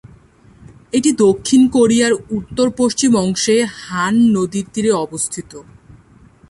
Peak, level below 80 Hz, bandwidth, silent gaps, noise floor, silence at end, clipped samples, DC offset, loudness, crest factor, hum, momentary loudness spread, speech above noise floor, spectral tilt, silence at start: -2 dBFS; -48 dBFS; 11.5 kHz; none; -46 dBFS; 0.9 s; under 0.1%; under 0.1%; -15 LUFS; 14 dB; none; 9 LU; 31 dB; -4.5 dB/octave; 0.95 s